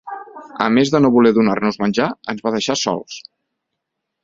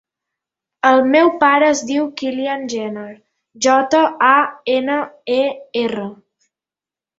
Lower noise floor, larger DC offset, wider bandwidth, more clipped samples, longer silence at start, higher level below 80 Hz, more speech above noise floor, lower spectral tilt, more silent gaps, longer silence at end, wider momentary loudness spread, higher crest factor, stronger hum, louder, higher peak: second, -78 dBFS vs -90 dBFS; neither; about the same, 7.8 kHz vs 8 kHz; neither; second, 0.05 s vs 0.85 s; first, -56 dBFS vs -64 dBFS; second, 61 dB vs 74 dB; first, -5 dB/octave vs -3 dB/octave; neither; about the same, 1.05 s vs 1.05 s; first, 20 LU vs 12 LU; about the same, 18 dB vs 16 dB; neither; about the same, -17 LUFS vs -16 LUFS; about the same, 0 dBFS vs -2 dBFS